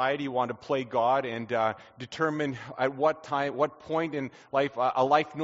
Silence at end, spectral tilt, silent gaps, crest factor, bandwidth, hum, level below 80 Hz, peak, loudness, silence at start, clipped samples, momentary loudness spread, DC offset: 0 s; -4 dB/octave; none; 20 dB; 7.6 kHz; none; -72 dBFS; -8 dBFS; -28 LUFS; 0 s; under 0.1%; 7 LU; under 0.1%